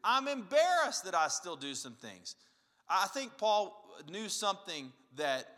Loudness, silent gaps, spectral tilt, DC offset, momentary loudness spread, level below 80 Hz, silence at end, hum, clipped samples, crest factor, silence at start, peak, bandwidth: -34 LUFS; none; -1.5 dB/octave; under 0.1%; 17 LU; under -90 dBFS; 0.05 s; none; under 0.1%; 20 dB; 0.05 s; -14 dBFS; 16 kHz